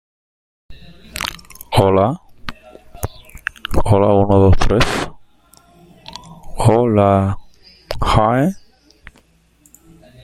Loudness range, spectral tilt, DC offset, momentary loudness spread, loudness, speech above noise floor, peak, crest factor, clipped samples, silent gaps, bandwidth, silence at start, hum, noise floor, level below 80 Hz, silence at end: 5 LU; -6.5 dB/octave; under 0.1%; 21 LU; -16 LUFS; 41 dB; 0 dBFS; 16 dB; under 0.1%; none; 16 kHz; 0.7 s; none; -54 dBFS; -28 dBFS; 1.65 s